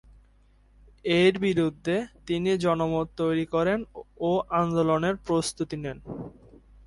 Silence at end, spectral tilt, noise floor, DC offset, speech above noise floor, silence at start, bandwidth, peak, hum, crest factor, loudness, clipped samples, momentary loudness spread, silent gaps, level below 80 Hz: 0.55 s; -6 dB/octave; -59 dBFS; under 0.1%; 33 dB; 1.05 s; 11.5 kHz; -10 dBFS; none; 16 dB; -26 LUFS; under 0.1%; 14 LU; none; -54 dBFS